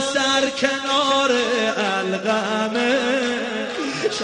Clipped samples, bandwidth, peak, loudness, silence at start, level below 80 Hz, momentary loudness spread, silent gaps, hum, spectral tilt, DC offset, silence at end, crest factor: under 0.1%; 10.5 kHz; -4 dBFS; -20 LUFS; 0 s; -60 dBFS; 6 LU; none; none; -2.5 dB/octave; under 0.1%; 0 s; 16 dB